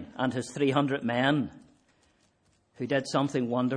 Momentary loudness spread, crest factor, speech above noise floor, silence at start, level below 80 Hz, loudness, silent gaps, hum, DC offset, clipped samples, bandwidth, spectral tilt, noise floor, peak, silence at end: 5 LU; 20 dB; 41 dB; 0 s; -68 dBFS; -29 LUFS; none; none; under 0.1%; under 0.1%; 10.5 kHz; -6 dB/octave; -69 dBFS; -10 dBFS; 0 s